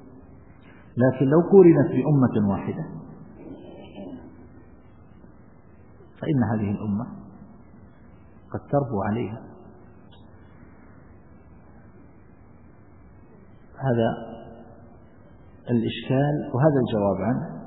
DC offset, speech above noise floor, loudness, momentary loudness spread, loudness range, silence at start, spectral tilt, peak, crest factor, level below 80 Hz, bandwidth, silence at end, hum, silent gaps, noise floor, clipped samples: 0.2%; 30 dB; -22 LUFS; 25 LU; 15 LU; 0.95 s; -12.5 dB/octave; -2 dBFS; 22 dB; -56 dBFS; 4 kHz; 0 s; none; none; -51 dBFS; under 0.1%